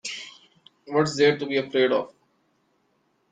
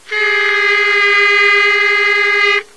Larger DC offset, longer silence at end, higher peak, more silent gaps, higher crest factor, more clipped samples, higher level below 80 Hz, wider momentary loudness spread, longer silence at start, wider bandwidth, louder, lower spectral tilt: second, under 0.1% vs 0.7%; first, 1.25 s vs 0.15 s; second, -6 dBFS vs 0 dBFS; neither; first, 20 dB vs 12 dB; neither; second, -70 dBFS vs -58 dBFS; first, 18 LU vs 3 LU; about the same, 0.05 s vs 0.1 s; second, 9.4 kHz vs 11 kHz; second, -23 LUFS vs -10 LUFS; first, -4.5 dB/octave vs 0.5 dB/octave